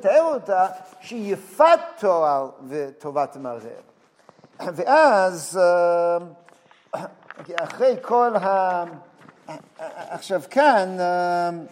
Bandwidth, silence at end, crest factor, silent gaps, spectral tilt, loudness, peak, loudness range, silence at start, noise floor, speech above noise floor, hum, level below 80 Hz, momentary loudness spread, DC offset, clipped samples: 16 kHz; 0.05 s; 18 dB; none; -4.5 dB/octave; -21 LUFS; -4 dBFS; 3 LU; 0 s; -54 dBFS; 33 dB; none; -84 dBFS; 20 LU; under 0.1%; under 0.1%